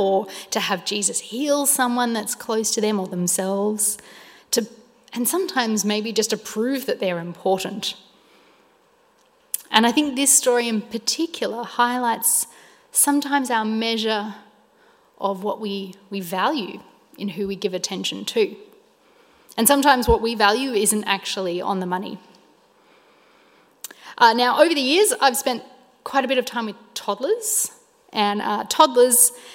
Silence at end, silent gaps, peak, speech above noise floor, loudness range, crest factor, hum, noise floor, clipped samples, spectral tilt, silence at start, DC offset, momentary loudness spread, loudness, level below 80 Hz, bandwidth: 0 s; none; 0 dBFS; 38 dB; 7 LU; 22 dB; none; -59 dBFS; under 0.1%; -2.5 dB/octave; 0 s; under 0.1%; 14 LU; -20 LUFS; -48 dBFS; 16.5 kHz